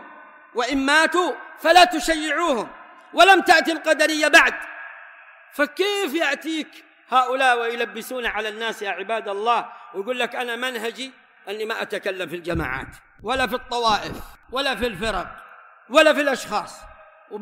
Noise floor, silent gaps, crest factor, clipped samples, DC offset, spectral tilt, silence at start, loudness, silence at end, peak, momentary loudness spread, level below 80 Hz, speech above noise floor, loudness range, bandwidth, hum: -46 dBFS; none; 18 dB; under 0.1%; under 0.1%; -2.5 dB/octave; 0 s; -20 LUFS; 0 s; -4 dBFS; 20 LU; -48 dBFS; 25 dB; 9 LU; 16 kHz; none